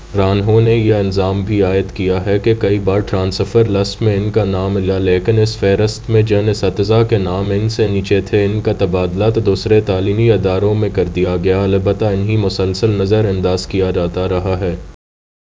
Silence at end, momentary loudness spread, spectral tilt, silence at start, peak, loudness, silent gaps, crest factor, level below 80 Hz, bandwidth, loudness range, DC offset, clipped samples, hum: 0.65 s; 4 LU; -7.5 dB/octave; 0 s; 0 dBFS; -15 LUFS; none; 14 dB; -30 dBFS; 7.8 kHz; 1 LU; under 0.1%; under 0.1%; none